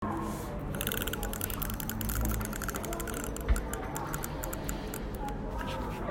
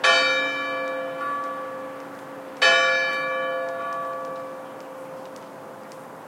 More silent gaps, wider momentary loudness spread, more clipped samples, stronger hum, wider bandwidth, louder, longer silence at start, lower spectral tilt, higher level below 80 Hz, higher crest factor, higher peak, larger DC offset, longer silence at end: neither; second, 5 LU vs 21 LU; neither; neither; about the same, 16.5 kHz vs 16.5 kHz; second, -35 LUFS vs -23 LUFS; about the same, 0 s vs 0 s; first, -4.5 dB/octave vs -1 dB/octave; first, -38 dBFS vs -84 dBFS; about the same, 26 dB vs 22 dB; second, -8 dBFS vs -4 dBFS; neither; about the same, 0 s vs 0 s